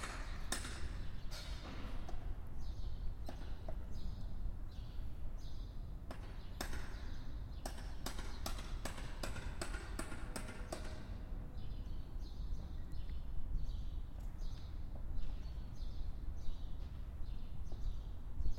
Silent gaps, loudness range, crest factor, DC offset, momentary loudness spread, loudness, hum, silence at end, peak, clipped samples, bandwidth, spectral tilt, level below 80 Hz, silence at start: none; 3 LU; 18 dB; under 0.1%; 4 LU; -49 LUFS; none; 0 s; -24 dBFS; under 0.1%; 16 kHz; -4.5 dB/octave; -44 dBFS; 0 s